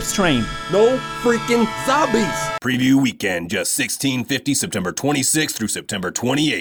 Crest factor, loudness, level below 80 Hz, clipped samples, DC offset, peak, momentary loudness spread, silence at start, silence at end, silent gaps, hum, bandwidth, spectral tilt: 16 dB; -19 LUFS; -44 dBFS; under 0.1%; under 0.1%; -4 dBFS; 6 LU; 0 s; 0 s; none; none; over 20 kHz; -3.5 dB/octave